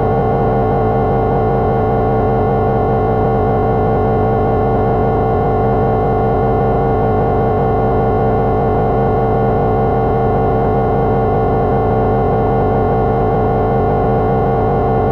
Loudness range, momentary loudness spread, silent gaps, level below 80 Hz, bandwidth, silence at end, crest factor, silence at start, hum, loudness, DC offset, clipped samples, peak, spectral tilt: 0 LU; 0 LU; none; -26 dBFS; 5.4 kHz; 0 s; 8 dB; 0 s; none; -14 LUFS; under 0.1%; under 0.1%; -4 dBFS; -11 dB/octave